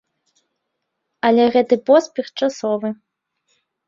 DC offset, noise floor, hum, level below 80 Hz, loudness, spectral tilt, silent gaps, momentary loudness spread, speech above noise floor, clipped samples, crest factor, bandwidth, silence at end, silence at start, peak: under 0.1%; -76 dBFS; none; -66 dBFS; -18 LUFS; -5 dB/octave; none; 13 LU; 60 dB; under 0.1%; 18 dB; 7.6 kHz; 0.95 s; 1.25 s; -2 dBFS